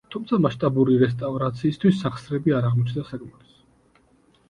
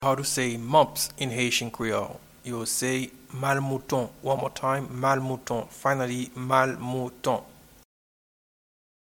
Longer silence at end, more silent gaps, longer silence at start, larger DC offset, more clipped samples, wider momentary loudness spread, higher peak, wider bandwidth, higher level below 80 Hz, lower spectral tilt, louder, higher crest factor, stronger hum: second, 1.2 s vs 1.6 s; neither; about the same, 0.1 s vs 0 s; neither; neither; about the same, 8 LU vs 9 LU; about the same, -4 dBFS vs -6 dBFS; second, 10 kHz vs 19 kHz; about the same, -56 dBFS vs -60 dBFS; first, -9 dB/octave vs -4 dB/octave; first, -22 LUFS vs -27 LUFS; about the same, 18 dB vs 22 dB; neither